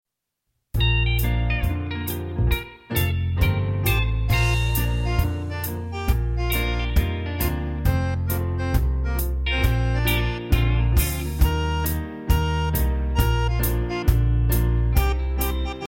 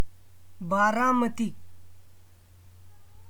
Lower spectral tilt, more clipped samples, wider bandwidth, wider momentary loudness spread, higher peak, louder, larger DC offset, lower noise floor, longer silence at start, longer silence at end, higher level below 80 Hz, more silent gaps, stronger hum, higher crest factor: about the same, -5.5 dB/octave vs -5.5 dB/octave; neither; second, 17 kHz vs 19.5 kHz; second, 5 LU vs 16 LU; first, -6 dBFS vs -12 dBFS; first, -23 LUFS vs -26 LUFS; neither; first, -79 dBFS vs -54 dBFS; first, 0.75 s vs 0 s; about the same, 0 s vs 0 s; first, -24 dBFS vs -60 dBFS; neither; neither; about the same, 16 dB vs 18 dB